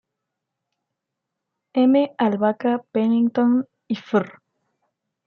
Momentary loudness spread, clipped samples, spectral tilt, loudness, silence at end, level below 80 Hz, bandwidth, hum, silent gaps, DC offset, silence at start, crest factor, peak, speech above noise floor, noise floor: 10 LU; under 0.1%; -8.5 dB/octave; -21 LUFS; 0.95 s; -74 dBFS; 5.6 kHz; none; none; under 0.1%; 1.75 s; 16 dB; -6 dBFS; 63 dB; -82 dBFS